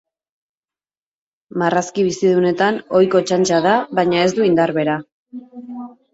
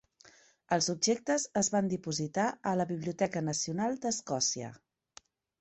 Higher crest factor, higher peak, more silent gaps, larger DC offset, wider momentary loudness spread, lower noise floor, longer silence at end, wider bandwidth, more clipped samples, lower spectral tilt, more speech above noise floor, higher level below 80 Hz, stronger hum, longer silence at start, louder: about the same, 16 dB vs 20 dB; first, -2 dBFS vs -14 dBFS; first, 5.12-5.26 s vs none; neither; first, 19 LU vs 5 LU; first, under -90 dBFS vs -61 dBFS; second, 0.25 s vs 0.85 s; about the same, 8 kHz vs 8.4 kHz; neither; first, -5 dB/octave vs -3.5 dB/octave; first, over 74 dB vs 29 dB; first, -60 dBFS vs -70 dBFS; neither; first, 1.55 s vs 0.7 s; first, -16 LUFS vs -32 LUFS